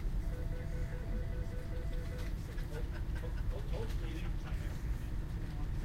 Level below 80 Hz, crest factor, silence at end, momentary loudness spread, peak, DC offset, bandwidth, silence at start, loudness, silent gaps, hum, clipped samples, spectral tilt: -38 dBFS; 12 dB; 0 s; 2 LU; -26 dBFS; under 0.1%; 15.5 kHz; 0 s; -42 LUFS; none; none; under 0.1%; -7 dB/octave